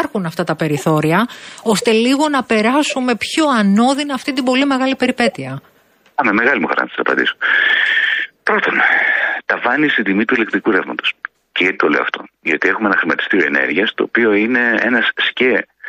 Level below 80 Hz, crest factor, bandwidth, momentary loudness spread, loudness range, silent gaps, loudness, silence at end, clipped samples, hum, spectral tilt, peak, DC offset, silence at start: -60 dBFS; 14 dB; 15.5 kHz; 7 LU; 2 LU; none; -15 LUFS; 0 s; under 0.1%; none; -4.5 dB/octave; -2 dBFS; under 0.1%; 0 s